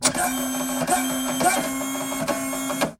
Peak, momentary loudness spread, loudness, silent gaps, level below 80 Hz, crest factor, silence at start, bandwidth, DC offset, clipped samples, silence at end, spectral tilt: -4 dBFS; 5 LU; -23 LUFS; none; -54 dBFS; 20 dB; 0 s; 16.5 kHz; under 0.1%; under 0.1%; 0.05 s; -2.5 dB/octave